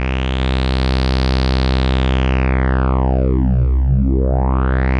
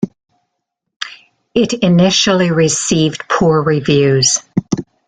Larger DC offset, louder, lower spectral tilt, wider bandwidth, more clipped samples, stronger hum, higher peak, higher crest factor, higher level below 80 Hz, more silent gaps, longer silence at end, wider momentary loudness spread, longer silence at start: neither; second, -17 LUFS vs -13 LUFS; first, -7.5 dB/octave vs -4.5 dB/octave; second, 6.4 kHz vs 9.6 kHz; neither; neither; second, -4 dBFS vs 0 dBFS; about the same, 10 dB vs 14 dB; first, -16 dBFS vs -46 dBFS; second, none vs 0.96-1.00 s; second, 0 s vs 0.25 s; second, 2 LU vs 13 LU; about the same, 0 s vs 0 s